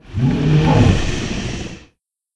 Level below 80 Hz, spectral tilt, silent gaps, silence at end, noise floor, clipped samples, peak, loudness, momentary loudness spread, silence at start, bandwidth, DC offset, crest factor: -28 dBFS; -6.5 dB/octave; none; 0.5 s; -58 dBFS; under 0.1%; 0 dBFS; -16 LUFS; 14 LU; 0.05 s; 10 kHz; under 0.1%; 16 dB